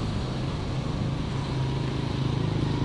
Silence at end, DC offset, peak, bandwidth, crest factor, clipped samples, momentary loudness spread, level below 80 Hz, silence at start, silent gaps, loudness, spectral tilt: 0 s; under 0.1%; -12 dBFS; 11 kHz; 14 dB; under 0.1%; 3 LU; -38 dBFS; 0 s; none; -29 LUFS; -7 dB/octave